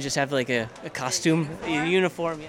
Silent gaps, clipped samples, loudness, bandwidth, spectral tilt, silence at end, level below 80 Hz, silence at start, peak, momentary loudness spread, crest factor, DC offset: none; under 0.1%; -25 LUFS; 16.5 kHz; -4 dB/octave; 0 s; -58 dBFS; 0 s; -10 dBFS; 5 LU; 16 dB; under 0.1%